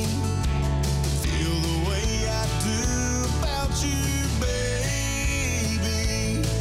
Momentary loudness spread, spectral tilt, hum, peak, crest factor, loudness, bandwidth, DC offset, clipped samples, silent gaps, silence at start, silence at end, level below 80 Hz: 1 LU; -4.5 dB/octave; none; -14 dBFS; 12 dB; -25 LUFS; 16 kHz; under 0.1%; under 0.1%; none; 0 s; 0 s; -28 dBFS